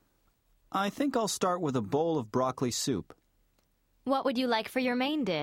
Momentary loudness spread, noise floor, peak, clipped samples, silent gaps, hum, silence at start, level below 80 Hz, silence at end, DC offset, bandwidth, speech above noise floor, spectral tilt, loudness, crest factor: 4 LU; -71 dBFS; -14 dBFS; under 0.1%; none; none; 0.7 s; -68 dBFS; 0 s; under 0.1%; 16.5 kHz; 41 dB; -4.5 dB/octave; -30 LUFS; 16 dB